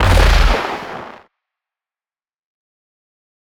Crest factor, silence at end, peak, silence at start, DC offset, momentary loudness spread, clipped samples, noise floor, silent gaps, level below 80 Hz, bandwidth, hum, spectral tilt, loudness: 18 dB; 2.25 s; 0 dBFS; 0 s; under 0.1%; 19 LU; under 0.1%; under -90 dBFS; none; -20 dBFS; 16 kHz; none; -5 dB/octave; -15 LUFS